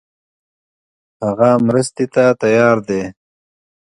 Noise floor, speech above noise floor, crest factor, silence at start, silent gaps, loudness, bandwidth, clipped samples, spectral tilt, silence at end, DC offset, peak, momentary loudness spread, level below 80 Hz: under -90 dBFS; over 76 dB; 16 dB; 1.2 s; none; -15 LUFS; 11.5 kHz; under 0.1%; -6.5 dB/octave; 0.85 s; under 0.1%; 0 dBFS; 10 LU; -56 dBFS